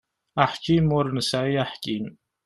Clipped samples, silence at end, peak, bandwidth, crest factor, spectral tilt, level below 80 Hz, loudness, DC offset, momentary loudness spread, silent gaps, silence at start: under 0.1%; 0.35 s; -4 dBFS; 12.5 kHz; 20 dB; -6 dB/octave; -52 dBFS; -24 LUFS; under 0.1%; 11 LU; none; 0.35 s